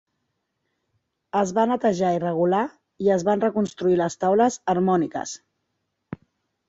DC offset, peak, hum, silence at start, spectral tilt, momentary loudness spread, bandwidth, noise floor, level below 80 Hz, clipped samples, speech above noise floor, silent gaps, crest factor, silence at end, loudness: under 0.1%; -6 dBFS; none; 1.35 s; -6 dB/octave; 16 LU; 8 kHz; -77 dBFS; -62 dBFS; under 0.1%; 55 dB; none; 18 dB; 0.55 s; -22 LUFS